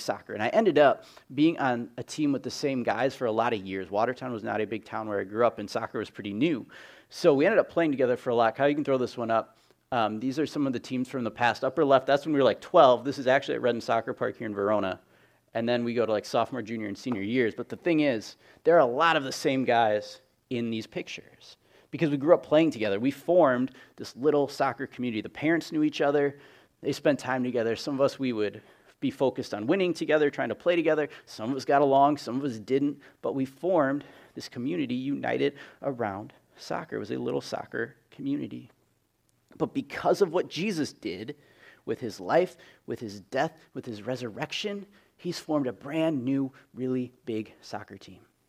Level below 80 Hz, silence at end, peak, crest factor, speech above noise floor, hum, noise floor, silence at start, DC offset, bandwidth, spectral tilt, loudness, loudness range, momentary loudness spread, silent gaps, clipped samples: -72 dBFS; 0.35 s; -6 dBFS; 22 dB; 44 dB; none; -71 dBFS; 0 s; under 0.1%; 15 kHz; -6 dB/octave; -28 LUFS; 7 LU; 14 LU; none; under 0.1%